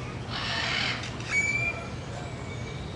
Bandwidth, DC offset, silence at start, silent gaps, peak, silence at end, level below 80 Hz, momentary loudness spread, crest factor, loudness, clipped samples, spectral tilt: 11.5 kHz; under 0.1%; 0 s; none; -14 dBFS; 0 s; -48 dBFS; 12 LU; 18 dB; -29 LUFS; under 0.1%; -3.5 dB/octave